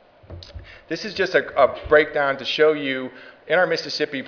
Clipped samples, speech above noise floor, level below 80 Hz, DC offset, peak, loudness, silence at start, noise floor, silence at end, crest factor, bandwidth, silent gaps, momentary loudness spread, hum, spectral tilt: under 0.1%; 20 dB; -48 dBFS; under 0.1%; -2 dBFS; -20 LUFS; 0.3 s; -41 dBFS; 0 s; 20 dB; 5.4 kHz; none; 20 LU; none; -4.5 dB/octave